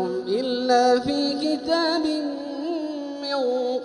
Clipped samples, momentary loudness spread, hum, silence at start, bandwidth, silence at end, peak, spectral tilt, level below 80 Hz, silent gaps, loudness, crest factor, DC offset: under 0.1%; 10 LU; none; 0 s; 11 kHz; 0 s; -8 dBFS; -4 dB/octave; -62 dBFS; none; -23 LUFS; 16 dB; under 0.1%